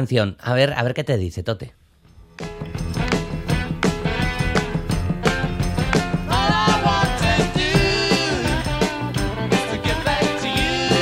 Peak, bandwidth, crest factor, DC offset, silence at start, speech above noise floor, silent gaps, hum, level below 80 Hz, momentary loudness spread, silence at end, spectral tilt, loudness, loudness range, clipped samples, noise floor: -2 dBFS; 16 kHz; 18 dB; under 0.1%; 0 s; 28 dB; none; none; -32 dBFS; 8 LU; 0 s; -5 dB/octave; -21 LUFS; 6 LU; under 0.1%; -49 dBFS